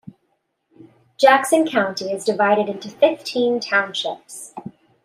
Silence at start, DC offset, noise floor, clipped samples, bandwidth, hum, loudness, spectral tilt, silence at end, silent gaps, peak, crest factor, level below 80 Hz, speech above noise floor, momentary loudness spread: 1.2 s; under 0.1%; -70 dBFS; under 0.1%; 15 kHz; none; -19 LUFS; -3.5 dB/octave; 0.35 s; none; -2 dBFS; 18 dB; -72 dBFS; 51 dB; 19 LU